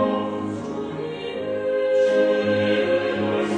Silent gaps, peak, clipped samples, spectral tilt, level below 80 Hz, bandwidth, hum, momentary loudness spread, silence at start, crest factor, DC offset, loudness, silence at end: none; -8 dBFS; under 0.1%; -6 dB/octave; -60 dBFS; 9.2 kHz; none; 10 LU; 0 s; 12 dB; under 0.1%; -22 LUFS; 0 s